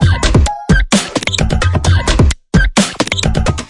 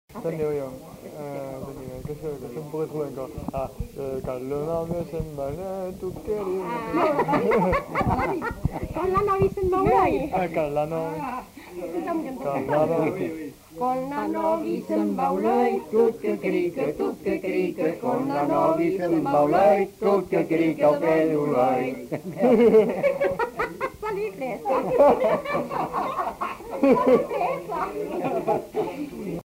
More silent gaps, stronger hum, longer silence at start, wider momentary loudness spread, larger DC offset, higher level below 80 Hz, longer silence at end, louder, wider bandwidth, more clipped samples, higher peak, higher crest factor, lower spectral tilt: neither; neither; about the same, 0 s vs 0.1 s; second, 3 LU vs 13 LU; neither; first, -18 dBFS vs -46 dBFS; about the same, 0 s vs 0 s; first, -13 LUFS vs -24 LUFS; second, 11.5 kHz vs 16 kHz; neither; first, 0 dBFS vs -8 dBFS; about the same, 12 dB vs 16 dB; second, -4.5 dB/octave vs -7.5 dB/octave